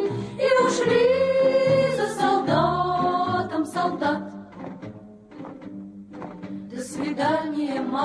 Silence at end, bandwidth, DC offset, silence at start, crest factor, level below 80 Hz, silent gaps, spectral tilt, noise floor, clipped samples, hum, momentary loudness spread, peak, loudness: 0 s; 11 kHz; under 0.1%; 0 s; 16 dB; -56 dBFS; none; -5.5 dB/octave; -43 dBFS; under 0.1%; none; 19 LU; -8 dBFS; -22 LUFS